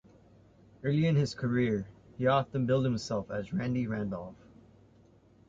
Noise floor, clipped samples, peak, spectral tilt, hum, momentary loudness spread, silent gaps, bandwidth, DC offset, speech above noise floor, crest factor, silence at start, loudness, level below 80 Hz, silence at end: -61 dBFS; under 0.1%; -14 dBFS; -7.5 dB/octave; none; 10 LU; none; 7.8 kHz; under 0.1%; 31 dB; 18 dB; 0.85 s; -31 LUFS; -60 dBFS; 1.15 s